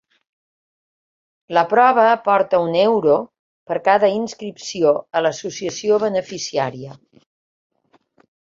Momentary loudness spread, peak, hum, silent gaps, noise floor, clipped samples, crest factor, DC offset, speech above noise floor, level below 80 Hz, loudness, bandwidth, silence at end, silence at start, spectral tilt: 13 LU; -2 dBFS; none; 3.39-3.66 s; -58 dBFS; under 0.1%; 18 dB; under 0.1%; 41 dB; -66 dBFS; -18 LUFS; 7.8 kHz; 1.5 s; 1.5 s; -4.5 dB/octave